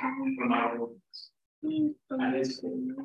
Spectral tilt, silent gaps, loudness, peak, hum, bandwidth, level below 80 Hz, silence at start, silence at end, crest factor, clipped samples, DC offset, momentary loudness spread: -5.5 dB/octave; 1.46-1.62 s; -31 LUFS; -14 dBFS; none; 8.2 kHz; -80 dBFS; 0 s; 0 s; 16 dB; under 0.1%; under 0.1%; 15 LU